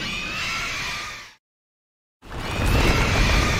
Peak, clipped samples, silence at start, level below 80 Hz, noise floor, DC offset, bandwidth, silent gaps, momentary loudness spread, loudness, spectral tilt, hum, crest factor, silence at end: -6 dBFS; under 0.1%; 0 s; -28 dBFS; under -90 dBFS; under 0.1%; 16.5 kHz; 1.39-2.20 s; 14 LU; -23 LUFS; -4 dB/octave; none; 18 dB; 0 s